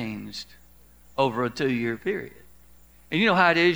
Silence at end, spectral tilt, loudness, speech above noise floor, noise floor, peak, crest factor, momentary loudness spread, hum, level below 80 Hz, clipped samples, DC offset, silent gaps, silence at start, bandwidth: 0 s; -5.5 dB/octave; -24 LUFS; 32 dB; -55 dBFS; -4 dBFS; 22 dB; 19 LU; none; -58 dBFS; under 0.1%; 0.2%; none; 0 s; over 20 kHz